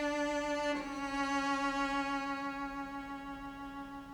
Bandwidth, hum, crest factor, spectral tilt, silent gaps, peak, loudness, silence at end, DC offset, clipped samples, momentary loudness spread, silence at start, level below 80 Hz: 20 kHz; none; 12 dB; -3.5 dB/octave; none; -24 dBFS; -37 LUFS; 0 s; under 0.1%; under 0.1%; 11 LU; 0 s; -58 dBFS